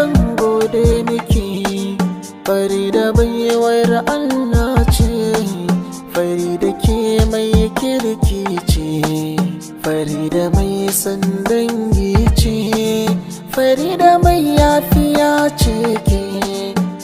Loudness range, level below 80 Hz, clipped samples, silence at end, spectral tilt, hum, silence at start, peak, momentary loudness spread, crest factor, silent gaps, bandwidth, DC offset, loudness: 4 LU; -24 dBFS; under 0.1%; 0 s; -6 dB/octave; none; 0 s; 0 dBFS; 7 LU; 14 dB; none; 16.5 kHz; under 0.1%; -15 LUFS